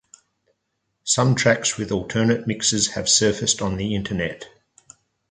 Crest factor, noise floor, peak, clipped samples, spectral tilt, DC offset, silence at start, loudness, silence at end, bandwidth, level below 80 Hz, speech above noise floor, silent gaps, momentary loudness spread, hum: 20 dB; -75 dBFS; -4 dBFS; under 0.1%; -3.5 dB/octave; under 0.1%; 1.05 s; -20 LUFS; 0.8 s; 9.6 kHz; -48 dBFS; 54 dB; none; 9 LU; none